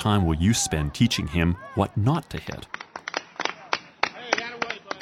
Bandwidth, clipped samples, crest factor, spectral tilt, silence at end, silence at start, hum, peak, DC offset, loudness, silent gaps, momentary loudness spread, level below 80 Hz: 16 kHz; under 0.1%; 22 dB; -4.5 dB/octave; 0 s; 0 s; none; -2 dBFS; under 0.1%; -26 LUFS; none; 13 LU; -40 dBFS